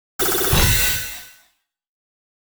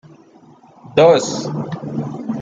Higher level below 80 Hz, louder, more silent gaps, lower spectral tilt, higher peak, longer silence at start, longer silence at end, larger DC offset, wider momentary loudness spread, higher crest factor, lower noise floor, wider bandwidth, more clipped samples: first, -30 dBFS vs -58 dBFS; about the same, -17 LUFS vs -17 LUFS; neither; second, -2.5 dB/octave vs -5.5 dB/octave; second, -4 dBFS vs 0 dBFS; second, 0.2 s vs 0.85 s; first, 1.2 s vs 0 s; neither; about the same, 14 LU vs 13 LU; about the same, 18 dB vs 18 dB; first, -62 dBFS vs -46 dBFS; first, over 20 kHz vs 7.8 kHz; neither